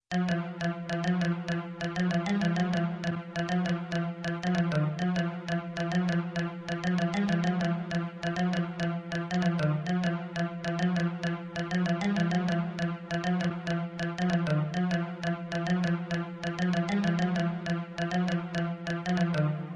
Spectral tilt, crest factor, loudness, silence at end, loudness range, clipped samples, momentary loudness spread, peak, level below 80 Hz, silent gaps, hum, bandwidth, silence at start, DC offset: -7 dB/octave; 14 dB; -30 LUFS; 0 s; 1 LU; under 0.1%; 6 LU; -14 dBFS; -60 dBFS; none; none; 7.8 kHz; 0.1 s; under 0.1%